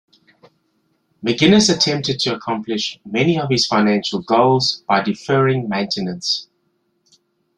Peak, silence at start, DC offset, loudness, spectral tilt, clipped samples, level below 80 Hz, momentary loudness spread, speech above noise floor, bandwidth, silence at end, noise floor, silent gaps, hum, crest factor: -2 dBFS; 1.25 s; under 0.1%; -17 LUFS; -4.5 dB/octave; under 0.1%; -56 dBFS; 10 LU; 49 dB; 11 kHz; 1.15 s; -67 dBFS; none; none; 18 dB